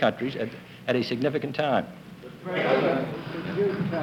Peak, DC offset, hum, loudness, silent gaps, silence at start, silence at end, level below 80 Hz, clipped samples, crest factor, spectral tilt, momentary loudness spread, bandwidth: -10 dBFS; under 0.1%; none; -27 LUFS; none; 0 s; 0 s; -64 dBFS; under 0.1%; 18 dB; -7 dB/octave; 14 LU; 17.5 kHz